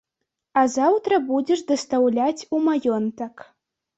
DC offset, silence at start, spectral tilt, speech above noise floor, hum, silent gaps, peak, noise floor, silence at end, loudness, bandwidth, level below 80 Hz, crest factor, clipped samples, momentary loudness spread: under 0.1%; 0.55 s; -4.5 dB/octave; 60 dB; none; none; -6 dBFS; -81 dBFS; 0.6 s; -21 LUFS; 8.2 kHz; -68 dBFS; 16 dB; under 0.1%; 7 LU